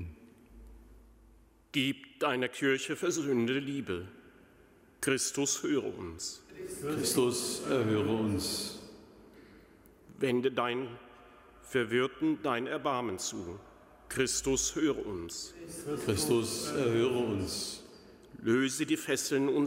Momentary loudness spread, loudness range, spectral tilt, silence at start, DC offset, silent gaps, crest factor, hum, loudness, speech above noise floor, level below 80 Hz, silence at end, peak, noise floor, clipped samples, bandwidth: 12 LU; 3 LU; -4 dB/octave; 0 s; under 0.1%; none; 18 dB; none; -32 LUFS; 29 dB; -60 dBFS; 0 s; -16 dBFS; -61 dBFS; under 0.1%; 16 kHz